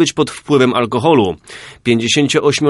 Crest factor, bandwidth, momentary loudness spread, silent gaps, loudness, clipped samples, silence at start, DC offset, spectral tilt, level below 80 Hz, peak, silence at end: 14 dB; 11.5 kHz; 9 LU; none; -14 LUFS; under 0.1%; 0 s; under 0.1%; -4.5 dB/octave; -50 dBFS; 0 dBFS; 0 s